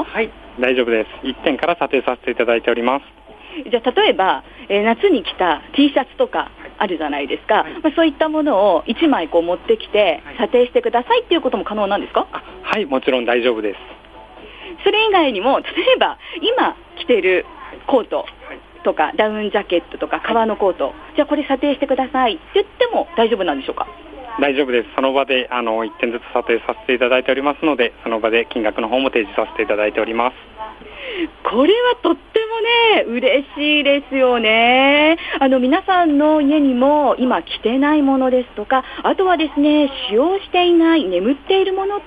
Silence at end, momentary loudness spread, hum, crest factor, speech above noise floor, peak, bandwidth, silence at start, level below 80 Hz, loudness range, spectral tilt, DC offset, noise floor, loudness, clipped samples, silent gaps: 0 s; 9 LU; none; 16 dB; 22 dB; -2 dBFS; 5 kHz; 0 s; -48 dBFS; 5 LU; -6 dB/octave; under 0.1%; -39 dBFS; -17 LUFS; under 0.1%; none